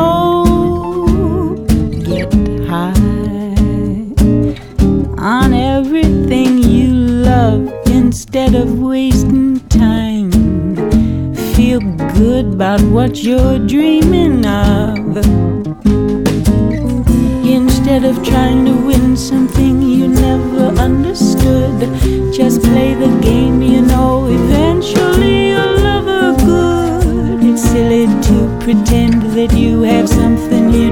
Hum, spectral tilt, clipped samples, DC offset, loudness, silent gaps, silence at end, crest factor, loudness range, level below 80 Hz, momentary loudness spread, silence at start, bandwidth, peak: none; -7 dB/octave; under 0.1%; under 0.1%; -12 LUFS; none; 0 s; 10 dB; 2 LU; -20 dBFS; 4 LU; 0 s; 18 kHz; 0 dBFS